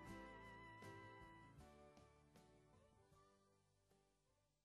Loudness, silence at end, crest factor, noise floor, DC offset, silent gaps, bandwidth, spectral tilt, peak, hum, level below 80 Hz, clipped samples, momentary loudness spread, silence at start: -62 LUFS; 0.05 s; 18 dB; -85 dBFS; under 0.1%; none; 13 kHz; -5.5 dB/octave; -46 dBFS; none; -76 dBFS; under 0.1%; 9 LU; 0 s